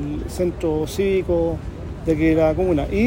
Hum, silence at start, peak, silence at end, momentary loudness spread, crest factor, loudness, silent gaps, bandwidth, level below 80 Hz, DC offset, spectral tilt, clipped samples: none; 0 s; -6 dBFS; 0 s; 10 LU; 14 dB; -21 LUFS; none; 16.5 kHz; -32 dBFS; under 0.1%; -7 dB/octave; under 0.1%